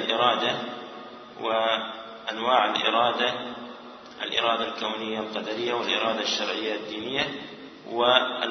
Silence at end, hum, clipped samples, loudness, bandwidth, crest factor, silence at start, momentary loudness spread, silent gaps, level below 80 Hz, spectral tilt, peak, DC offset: 0 s; none; under 0.1%; -25 LUFS; 6.4 kHz; 24 dB; 0 s; 17 LU; none; -70 dBFS; -3 dB/octave; -4 dBFS; under 0.1%